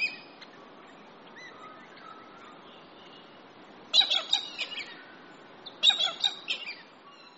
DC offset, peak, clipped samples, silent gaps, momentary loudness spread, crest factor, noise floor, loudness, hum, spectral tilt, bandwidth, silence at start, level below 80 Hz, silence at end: under 0.1%; -10 dBFS; under 0.1%; none; 28 LU; 24 dB; -52 dBFS; -26 LUFS; none; 3 dB/octave; 8 kHz; 0 s; -82 dBFS; 0.1 s